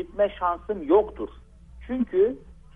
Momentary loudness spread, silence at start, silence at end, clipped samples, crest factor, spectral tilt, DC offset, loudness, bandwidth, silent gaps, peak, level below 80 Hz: 15 LU; 0 s; 0.2 s; under 0.1%; 18 dB; -8.5 dB/octave; under 0.1%; -25 LUFS; 3.7 kHz; none; -8 dBFS; -48 dBFS